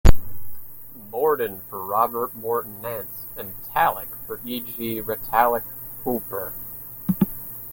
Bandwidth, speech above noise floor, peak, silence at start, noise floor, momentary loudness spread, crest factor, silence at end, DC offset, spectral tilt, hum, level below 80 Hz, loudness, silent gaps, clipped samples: 17 kHz; 16 dB; 0 dBFS; 0.05 s; -41 dBFS; 12 LU; 22 dB; 0 s; under 0.1%; -6 dB/octave; none; -28 dBFS; -26 LUFS; none; under 0.1%